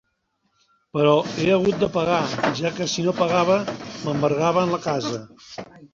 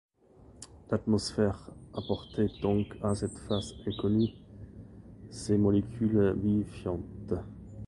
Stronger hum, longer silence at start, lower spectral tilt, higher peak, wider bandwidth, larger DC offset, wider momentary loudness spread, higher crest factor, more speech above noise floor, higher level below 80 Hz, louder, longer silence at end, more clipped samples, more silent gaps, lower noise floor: neither; first, 0.95 s vs 0.5 s; second, -5.5 dB/octave vs -7 dB/octave; first, -4 dBFS vs -14 dBFS; second, 7.8 kHz vs 11.5 kHz; neither; second, 12 LU vs 22 LU; about the same, 18 dB vs 18 dB; first, 50 dB vs 27 dB; second, -56 dBFS vs -50 dBFS; first, -22 LUFS vs -31 LUFS; about the same, 0.05 s vs 0 s; neither; neither; first, -71 dBFS vs -57 dBFS